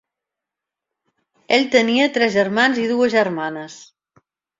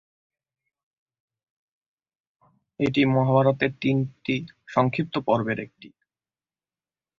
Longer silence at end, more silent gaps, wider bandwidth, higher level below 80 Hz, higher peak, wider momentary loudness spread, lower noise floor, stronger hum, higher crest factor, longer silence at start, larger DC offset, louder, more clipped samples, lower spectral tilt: second, 0.75 s vs 1.3 s; neither; about the same, 7.8 kHz vs 7.2 kHz; second, -66 dBFS vs -60 dBFS; first, -2 dBFS vs -6 dBFS; first, 12 LU vs 9 LU; second, -85 dBFS vs under -90 dBFS; neither; about the same, 20 dB vs 22 dB; second, 1.5 s vs 2.8 s; neither; first, -17 LUFS vs -24 LUFS; neither; second, -4 dB/octave vs -8 dB/octave